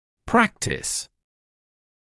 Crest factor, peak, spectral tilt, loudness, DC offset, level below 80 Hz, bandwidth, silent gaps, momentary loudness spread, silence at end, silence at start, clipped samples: 22 dB; -6 dBFS; -3.5 dB/octave; -23 LUFS; under 0.1%; -50 dBFS; 12 kHz; none; 9 LU; 1.05 s; 0.25 s; under 0.1%